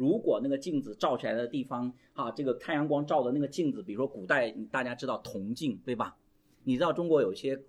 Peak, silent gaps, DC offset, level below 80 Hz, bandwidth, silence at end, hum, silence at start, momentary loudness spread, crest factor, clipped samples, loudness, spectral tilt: -12 dBFS; none; under 0.1%; -70 dBFS; 13 kHz; 0.05 s; none; 0 s; 9 LU; 20 dB; under 0.1%; -32 LUFS; -6.5 dB/octave